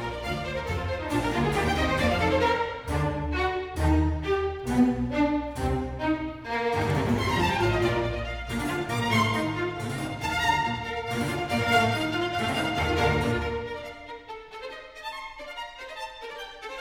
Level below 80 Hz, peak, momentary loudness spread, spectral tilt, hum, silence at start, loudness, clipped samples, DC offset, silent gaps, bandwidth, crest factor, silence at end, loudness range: -38 dBFS; -8 dBFS; 14 LU; -5.5 dB/octave; none; 0 s; -27 LUFS; under 0.1%; under 0.1%; none; 18 kHz; 18 dB; 0 s; 4 LU